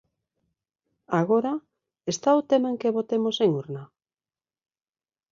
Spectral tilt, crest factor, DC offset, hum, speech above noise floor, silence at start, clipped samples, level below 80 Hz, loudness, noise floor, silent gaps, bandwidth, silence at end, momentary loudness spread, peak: -5.5 dB/octave; 18 dB; under 0.1%; none; over 66 dB; 1.1 s; under 0.1%; -72 dBFS; -25 LUFS; under -90 dBFS; none; 7.6 kHz; 1.45 s; 13 LU; -8 dBFS